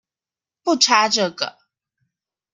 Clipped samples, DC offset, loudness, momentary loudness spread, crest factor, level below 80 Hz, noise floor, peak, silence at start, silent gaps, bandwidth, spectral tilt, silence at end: under 0.1%; under 0.1%; -18 LUFS; 13 LU; 22 dB; -72 dBFS; under -90 dBFS; 0 dBFS; 0.65 s; none; 11.5 kHz; -1.5 dB/octave; 1.05 s